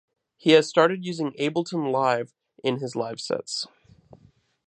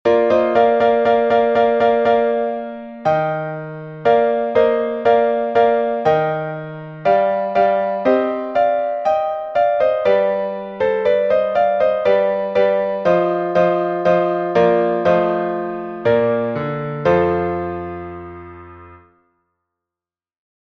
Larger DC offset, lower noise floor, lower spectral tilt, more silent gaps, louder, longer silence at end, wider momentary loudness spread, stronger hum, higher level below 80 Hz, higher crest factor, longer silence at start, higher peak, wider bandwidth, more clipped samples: neither; second, -60 dBFS vs -90 dBFS; second, -5 dB/octave vs -7.5 dB/octave; neither; second, -24 LUFS vs -17 LUFS; second, 1 s vs 1.75 s; about the same, 12 LU vs 10 LU; neither; second, -72 dBFS vs -52 dBFS; first, 22 dB vs 14 dB; first, 0.45 s vs 0.05 s; about the same, -4 dBFS vs -2 dBFS; first, 9.4 kHz vs 6.2 kHz; neither